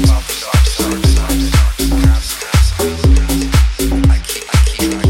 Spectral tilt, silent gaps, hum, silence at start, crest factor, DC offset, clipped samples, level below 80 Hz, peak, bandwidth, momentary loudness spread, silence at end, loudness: -5 dB/octave; none; none; 0 s; 12 dB; under 0.1%; under 0.1%; -14 dBFS; 0 dBFS; 17 kHz; 3 LU; 0 s; -14 LUFS